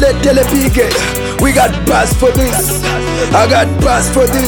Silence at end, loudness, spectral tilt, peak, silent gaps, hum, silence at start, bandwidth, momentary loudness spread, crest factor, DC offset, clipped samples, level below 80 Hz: 0 s; -11 LUFS; -4.5 dB/octave; 0 dBFS; none; none; 0 s; 19.5 kHz; 4 LU; 10 dB; under 0.1%; under 0.1%; -20 dBFS